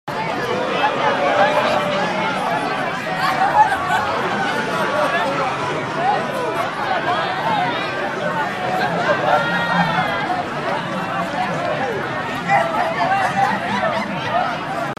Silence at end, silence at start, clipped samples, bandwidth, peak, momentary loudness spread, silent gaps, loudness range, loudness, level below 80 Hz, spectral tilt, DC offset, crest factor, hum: 0.05 s; 0.05 s; under 0.1%; 15 kHz; -2 dBFS; 6 LU; none; 2 LU; -19 LUFS; -54 dBFS; -5 dB/octave; under 0.1%; 18 dB; none